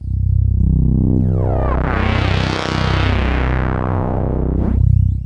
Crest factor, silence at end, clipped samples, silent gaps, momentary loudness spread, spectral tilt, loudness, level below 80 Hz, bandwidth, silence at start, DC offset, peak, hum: 14 dB; 0 s; under 0.1%; none; 4 LU; -7.5 dB/octave; -17 LUFS; -20 dBFS; 7.8 kHz; 0 s; under 0.1%; 0 dBFS; none